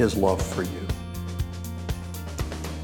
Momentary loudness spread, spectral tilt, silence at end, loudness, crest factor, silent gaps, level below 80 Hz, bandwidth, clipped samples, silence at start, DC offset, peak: 10 LU; -6 dB/octave; 0 s; -29 LUFS; 20 dB; none; -36 dBFS; 19 kHz; under 0.1%; 0 s; under 0.1%; -8 dBFS